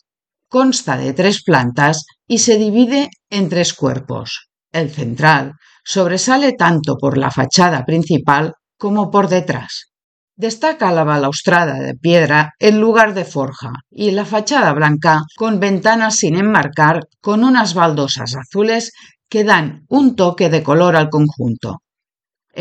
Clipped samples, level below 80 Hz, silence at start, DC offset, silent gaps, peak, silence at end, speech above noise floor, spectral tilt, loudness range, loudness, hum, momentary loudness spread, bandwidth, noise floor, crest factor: under 0.1%; -58 dBFS; 0.55 s; under 0.1%; 10.04-10.28 s; 0 dBFS; 0 s; 73 dB; -4.5 dB/octave; 3 LU; -14 LUFS; none; 11 LU; 9.2 kHz; -87 dBFS; 14 dB